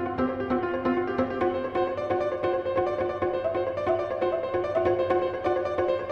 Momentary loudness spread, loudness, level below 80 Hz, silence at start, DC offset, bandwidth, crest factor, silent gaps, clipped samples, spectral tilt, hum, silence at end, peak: 3 LU; -27 LUFS; -52 dBFS; 0 s; under 0.1%; 6.6 kHz; 16 dB; none; under 0.1%; -8 dB/octave; none; 0 s; -10 dBFS